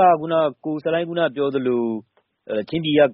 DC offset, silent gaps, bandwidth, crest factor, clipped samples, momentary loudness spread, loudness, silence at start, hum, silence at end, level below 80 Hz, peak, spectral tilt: under 0.1%; none; 5.4 kHz; 16 dB; under 0.1%; 10 LU; -22 LUFS; 0 s; none; 0 s; -62 dBFS; -4 dBFS; -4 dB/octave